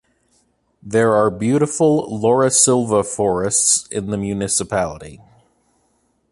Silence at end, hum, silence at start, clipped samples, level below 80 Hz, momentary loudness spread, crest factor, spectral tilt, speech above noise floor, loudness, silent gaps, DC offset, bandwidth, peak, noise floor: 1.15 s; none; 0.85 s; under 0.1%; -48 dBFS; 9 LU; 18 dB; -4 dB/octave; 47 dB; -17 LUFS; none; under 0.1%; 11.5 kHz; -2 dBFS; -64 dBFS